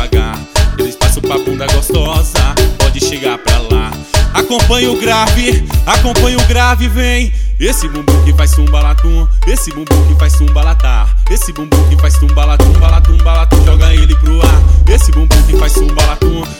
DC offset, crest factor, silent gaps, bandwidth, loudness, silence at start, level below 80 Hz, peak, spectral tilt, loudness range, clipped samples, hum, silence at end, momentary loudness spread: under 0.1%; 8 dB; none; 17 kHz; -11 LUFS; 0 s; -10 dBFS; 0 dBFS; -5 dB/octave; 4 LU; 0.7%; none; 0 s; 6 LU